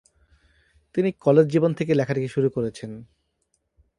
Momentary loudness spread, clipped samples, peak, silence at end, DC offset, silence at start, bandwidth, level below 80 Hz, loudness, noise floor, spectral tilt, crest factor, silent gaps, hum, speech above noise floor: 17 LU; under 0.1%; -4 dBFS; 0.95 s; under 0.1%; 0.95 s; 11 kHz; -60 dBFS; -22 LUFS; -73 dBFS; -8 dB/octave; 20 dB; none; none; 51 dB